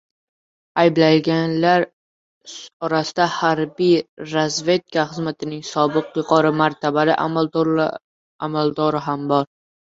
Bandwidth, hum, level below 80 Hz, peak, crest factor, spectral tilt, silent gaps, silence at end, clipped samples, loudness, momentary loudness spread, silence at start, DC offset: 7.8 kHz; none; -62 dBFS; -2 dBFS; 18 dB; -5.5 dB/octave; 1.93-2.41 s, 2.73-2.80 s, 4.09-4.17 s, 8.04-8.39 s; 0.45 s; under 0.1%; -19 LUFS; 11 LU; 0.75 s; under 0.1%